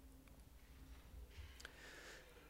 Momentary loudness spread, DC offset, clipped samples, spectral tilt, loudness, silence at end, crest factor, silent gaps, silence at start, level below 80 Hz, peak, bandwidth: 8 LU; under 0.1%; under 0.1%; -3.5 dB/octave; -60 LUFS; 0 s; 26 dB; none; 0 s; -62 dBFS; -32 dBFS; 16 kHz